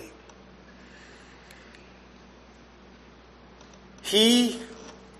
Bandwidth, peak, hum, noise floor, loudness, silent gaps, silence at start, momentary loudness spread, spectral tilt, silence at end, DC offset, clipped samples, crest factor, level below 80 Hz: 13 kHz; -8 dBFS; none; -51 dBFS; -22 LUFS; none; 0 s; 30 LU; -2.5 dB/octave; 0.3 s; under 0.1%; under 0.1%; 22 dB; -58 dBFS